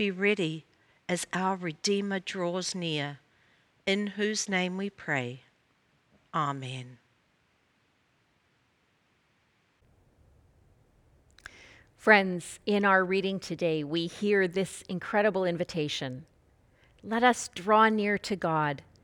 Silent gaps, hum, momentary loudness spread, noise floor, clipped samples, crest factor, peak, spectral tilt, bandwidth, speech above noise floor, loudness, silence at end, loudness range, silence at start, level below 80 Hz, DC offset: none; none; 16 LU; -70 dBFS; under 0.1%; 24 dB; -6 dBFS; -4.5 dB/octave; 16.5 kHz; 42 dB; -29 LUFS; 0.2 s; 13 LU; 0 s; -68 dBFS; under 0.1%